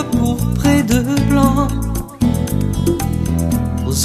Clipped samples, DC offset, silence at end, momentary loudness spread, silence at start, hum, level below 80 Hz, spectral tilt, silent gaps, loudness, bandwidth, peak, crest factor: under 0.1%; under 0.1%; 0 s; 5 LU; 0 s; none; -26 dBFS; -6 dB/octave; none; -16 LUFS; 14 kHz; 0 dBFS; 16 dB